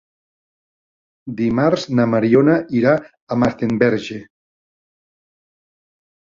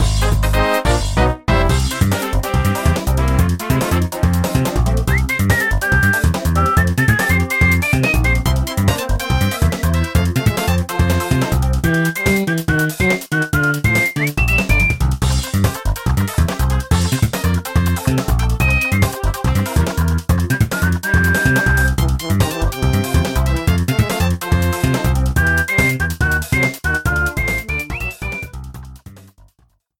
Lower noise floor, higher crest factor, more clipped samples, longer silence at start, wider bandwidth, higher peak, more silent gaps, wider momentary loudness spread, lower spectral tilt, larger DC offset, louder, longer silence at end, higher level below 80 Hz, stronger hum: first, under -90 dBFS vs -58 dBFS; about the same, 18 dB vs 14 dB; neither; first, 1.25 s vs 0 s; second, 7.6 kHz vs 17 kHz; about the same, -2 dBFS vs 0 dBFS; first, 3.22-3.27 s vs none; first, 16 LU vs 4 LU; first, -7.5 dB/octave vs -5.5 dB/octave; second, under 0.1% vs 0.1%; about the same, -17 LUFS vs -16 LUFS; first, 2.05 s vs 0.8 s; second, -52 dBFS vs -22 dBFS; neither